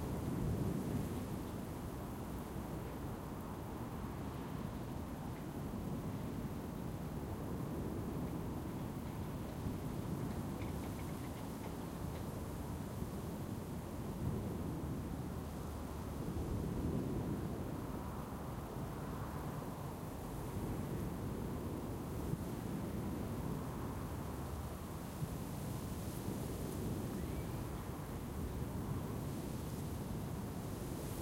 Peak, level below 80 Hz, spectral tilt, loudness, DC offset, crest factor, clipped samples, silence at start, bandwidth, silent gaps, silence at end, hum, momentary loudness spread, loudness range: -24 dBFS; -52 dBFS; -7 dB/octave; -44 LUFS; under 0.1%; 18 dB; under 0.1%; 0 s; 17 kHz; none; 0 s; none; 4 LU; 2 LU